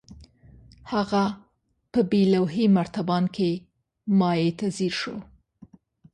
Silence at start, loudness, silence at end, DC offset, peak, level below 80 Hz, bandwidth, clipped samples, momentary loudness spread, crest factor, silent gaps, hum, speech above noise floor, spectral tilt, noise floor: 0.1 s; -24 LUFS; 0.9 s; under 0.1%; -10 dBFS; -58 dBFS; 9.8 kHz; under 0.1%; 12 LU; 16 dB; none; none; 47 dB; -7 dB/octave; -70 dBFS